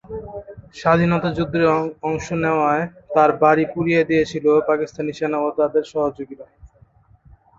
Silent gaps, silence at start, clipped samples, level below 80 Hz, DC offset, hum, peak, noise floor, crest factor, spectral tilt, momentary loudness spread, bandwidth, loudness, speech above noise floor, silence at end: none; 0.1 s; under 0.1%; -50 dBFS; under 0.1%; none; -2 dBFS; -53 dBFS; 18 dB; -7 dB/octave; 16 LU; 7.6 kHz; -19 LUFS; 34 dB; 0.95 s